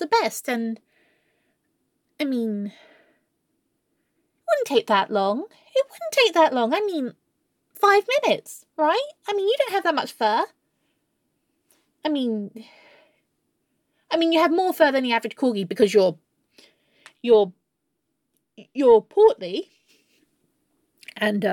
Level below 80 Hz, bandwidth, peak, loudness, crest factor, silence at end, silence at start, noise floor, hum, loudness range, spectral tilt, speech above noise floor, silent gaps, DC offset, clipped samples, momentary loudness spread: -70 dBFS; 17.5 kHz; -4 dBFS; -22 LUFS; 20 dB; 0 s; 0 s; -77 dBFS; none; 10 LU; -4 dB/octave; 56 dB; none; under 0.1%; under 0.1%; 13 LU